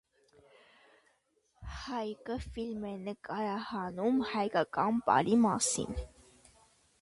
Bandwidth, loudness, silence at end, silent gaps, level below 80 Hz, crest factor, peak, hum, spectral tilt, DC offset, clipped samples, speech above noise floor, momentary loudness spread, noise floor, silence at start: 11.5 kHz; -33 LUFS; 0.95 s; none; -54 dBFS; 22 dB; -12 dBFS; none; -4.5 dB/octave; under 0.1%; under 0.1%; 42 dB; 15 LU; -74 dBFS; 1.6 s